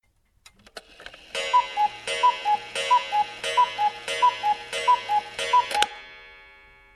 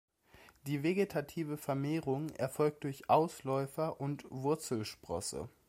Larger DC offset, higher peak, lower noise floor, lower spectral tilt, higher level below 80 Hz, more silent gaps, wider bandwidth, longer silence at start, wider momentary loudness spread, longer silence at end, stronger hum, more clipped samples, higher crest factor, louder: neither; first, -4 dBFS vs -14 dBFS; second, -57 dBFS vs -62 dBFS; second, 0 dB/octave vs -6 dB/octave; first, -62 dBFS vs -68 dBFS; neither; second, 13.5 kHz vs 16 kHz; first, 0.75 s vs 0.4 s; first, 21 LU vs 10 LU; first, 0.6 s vs 0.2 s; neither; neither; about the same, 22 dB vs 22 dB; first, -24 LUFS vs -36 LUFS